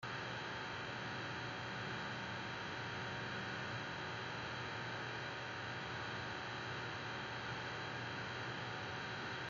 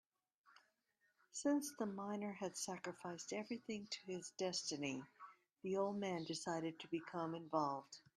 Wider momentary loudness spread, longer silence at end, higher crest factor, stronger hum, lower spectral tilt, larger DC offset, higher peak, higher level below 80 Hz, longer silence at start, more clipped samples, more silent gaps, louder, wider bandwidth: second, 1 LU vs 9 LU; second, 0 s vs 0.2 s; second, 14 dB vs 20 dB; neither; about the same, -4.5 dB/octave vs -4 dB/octave; neither; second, -32 dBFS vs -26 dBFS; first, -70 dBFS vs -88 dBFS; second, 0 s vs 0.5 s; neither; neither; about the same, -44 LUFS vs -45 LUFS; second, 7.6 kHz vs 13 kHz